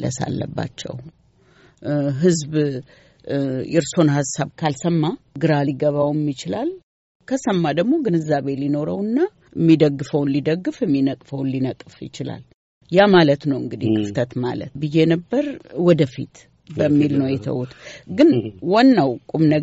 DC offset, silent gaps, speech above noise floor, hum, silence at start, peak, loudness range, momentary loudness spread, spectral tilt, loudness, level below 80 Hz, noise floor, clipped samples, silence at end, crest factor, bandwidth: under 0.1%; 6.83-7.20 s, 12.54-12.81 s; 34 dB; none; 0 s; -4 dBFS; 3 LU; 14 LU; -6.5 dB/octave; -20 LUFS; -56 dBFS; -53 dBFS; under 0.1%; 0 s; 16 dB; 8 kHz